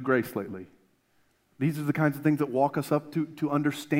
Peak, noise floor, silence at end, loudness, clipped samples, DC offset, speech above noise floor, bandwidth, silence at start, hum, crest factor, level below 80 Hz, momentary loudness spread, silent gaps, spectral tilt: -10 dBFS; -68 dBFS; 0 s; -28 LUFS; under 0.1%; under 0.1%; 41 dB; 16 kHz; 0 s; none; 18 dB; -74 dBFS; 9 LU; none; -7 dB/octave